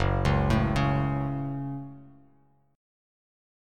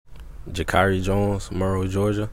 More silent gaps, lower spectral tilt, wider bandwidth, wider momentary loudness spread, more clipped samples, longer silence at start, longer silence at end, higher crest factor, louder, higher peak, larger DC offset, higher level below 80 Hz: neither; about the same, -7.5 dB/octave vs -6.5 dB/octave; second, 9.6 kHz vs 15.5 kHz; first, 13 LU vs 10 LU; neither; about the same, 0 s vs 0.1 s; first, 1.65 s vs 0 s; about the same, 18 dB vs 20 dB; second, -27 LUFS vs -23 LUFS; second, -10 dBFS vs -4 dBFS; second, under 0.1% vs 0.8%; about the same, -38 dBFS vs -36 dBFS